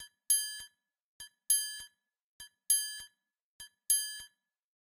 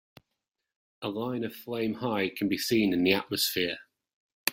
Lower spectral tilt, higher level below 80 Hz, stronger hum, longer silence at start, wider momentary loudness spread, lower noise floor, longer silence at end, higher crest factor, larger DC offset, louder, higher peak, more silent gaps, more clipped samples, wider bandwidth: second, 5 dB/octave vs -4 dB/octave; second, -76 dBFS vs -66 dBFS; neither; second, 0 s vs 1 s; first, 23 LU vs 10 LU; second, -62 dBFS vs -85 dBFS; first, 0.55 s vs 0 s; about the same, 22 dB vs 24 dB; neither; about the same, -30 LUFS vs -29 LUFS; second, -14 dBFS vs -8 dBFS; first, 1.02-1.20 s, 2.22-2.40 s, 3.41-3.59 s vs 4.13-4.46 s; neither; about the same, 16 kHz vs 16.5 kHz